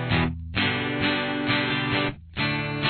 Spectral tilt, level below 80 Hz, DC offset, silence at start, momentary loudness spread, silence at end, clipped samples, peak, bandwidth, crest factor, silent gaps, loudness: -8.5 dB/octave; -44 dBFS; under 0.1%; 0 s; 4 LU; 0 s; under 0.1%; -10 dBFS; 4.6 kHz; 16 dB; none; -25 LUFS